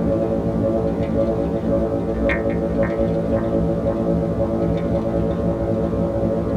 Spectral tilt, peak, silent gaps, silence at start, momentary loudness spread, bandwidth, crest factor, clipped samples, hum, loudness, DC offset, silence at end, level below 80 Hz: -9.5 dB/octave; -8 dBFS; none; 0 s; 1 LU; 8.8 kHz; 12 dB; under 0.1%; none; -21 LUFS; under 0.1%; 0 s; -32 dBFS